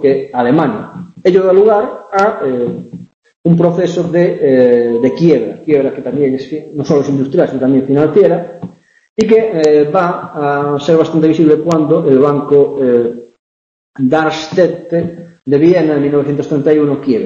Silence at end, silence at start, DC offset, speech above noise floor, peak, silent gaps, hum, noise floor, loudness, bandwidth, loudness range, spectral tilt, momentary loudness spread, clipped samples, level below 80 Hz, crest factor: 0 s; 0 s; under 0.1%; over 79 dB; 0 dBFS; 3.14-3.22 s, 3.36-3.44 s, 9.09-9.16 s, 13.39-13.93 s; none; under -90 dBFS; -12 LUFS; 7.8 kHz; 2 LU; -8 dB/octave; 10 LU; under 0.1%; -52 dBFS; 12 dB